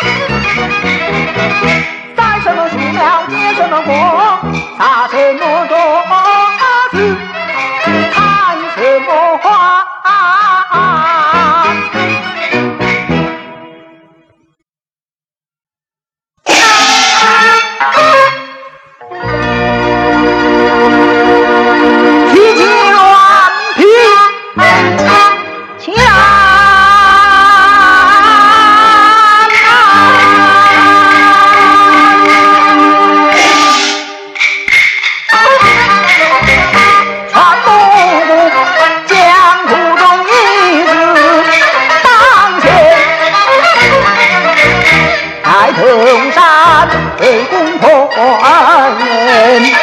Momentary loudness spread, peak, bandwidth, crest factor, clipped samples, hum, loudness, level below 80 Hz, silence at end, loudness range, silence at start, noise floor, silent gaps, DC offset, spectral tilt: 9 LU; 0 dBFS; 15.5 kHz; 8 dB; 0.9%; none; -6 LUFS; -36 dBFS; 0 s; 7 LU; 0 s; under -90 dBFS; none; under 0.1%; -3.5 dB/octave